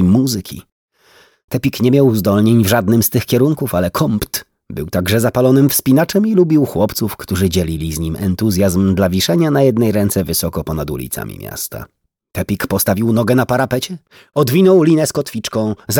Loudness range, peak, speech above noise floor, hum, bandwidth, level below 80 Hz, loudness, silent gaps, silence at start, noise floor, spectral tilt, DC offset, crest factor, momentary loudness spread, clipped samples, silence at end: 4 LU; 0 dBFS; 36 dB; none; over 20 kHz; -40 dBFS; -15 LUFS; 0.72-0.88 s, 1.44-1.48 s; 0 s; -50 dBFS; -5.5 dB/octave; under 0.1%; 14 dB; 13 LU; under 0.1%; 0 s